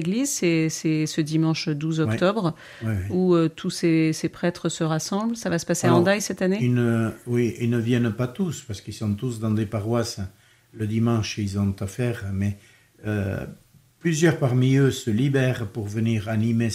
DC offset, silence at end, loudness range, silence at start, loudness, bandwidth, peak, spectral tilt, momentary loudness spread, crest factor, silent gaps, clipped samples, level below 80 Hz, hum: under 0.1%; 0 s; 4 LU; 0 s; -24 LUFS; 15.5 kHz; -6 dBFS; -6 dB/octave; 9 LU; 18 dB; none; under 0.1%; -58 dBFS; none